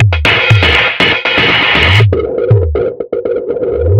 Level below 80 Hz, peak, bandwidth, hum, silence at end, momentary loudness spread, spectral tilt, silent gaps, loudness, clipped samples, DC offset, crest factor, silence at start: -24 dBFS; 0 dBFS; 9 kHz; none; 0 s; 9 LU; -6 dB/octave; none; -9 LUFS; 0.3%; under 0.1%; 10 dB; 0 s